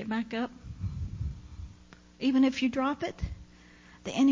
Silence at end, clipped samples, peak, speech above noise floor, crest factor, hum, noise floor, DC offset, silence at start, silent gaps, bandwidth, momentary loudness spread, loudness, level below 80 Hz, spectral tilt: 0 s; under 0.1%; -14 dBFS; 26 dB; 16 dB; none; -55 dBFS; under 0.1%; 0 s; none; 7.6 kHz; 21 LU; -31 LUFS; -44 dBFS; -6 dB/octave